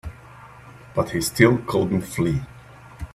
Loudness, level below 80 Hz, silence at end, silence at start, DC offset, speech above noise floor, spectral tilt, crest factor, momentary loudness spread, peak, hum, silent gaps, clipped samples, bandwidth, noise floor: -22 LUFS; -44 dBFS; 0.1 s; 0.05 s; under 0.1%; 24 dB; -5.5 dB/octave; 24 dB; 22 LU; 0 dBFS; none; none; under 0.1%; 16 kHz; -44 dBFS